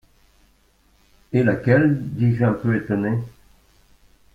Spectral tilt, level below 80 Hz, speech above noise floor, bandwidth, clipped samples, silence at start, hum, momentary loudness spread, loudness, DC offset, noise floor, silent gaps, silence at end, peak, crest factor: -10 dB/octave; -52 dBFS; 40 dB; 5 kHz; under 0.1%; 1.3 s; none; 8 LU; -20 LUFS; under 0.1%; -59 dBFS; none; 1.05 s; -4 dBFS; 18 dB